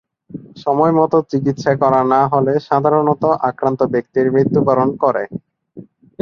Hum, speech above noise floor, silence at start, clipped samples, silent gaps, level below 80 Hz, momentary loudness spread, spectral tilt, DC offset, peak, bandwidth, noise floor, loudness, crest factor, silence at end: none; 25 dB; 0.35 s; under 0.1%; none; -56 dBFS; 11 LU; -8.5 dB/octave; under 0.1%; -2 dBFS; 7 kHz; -40 dBFS; -15 LUFS; 14 dB; 0.4 s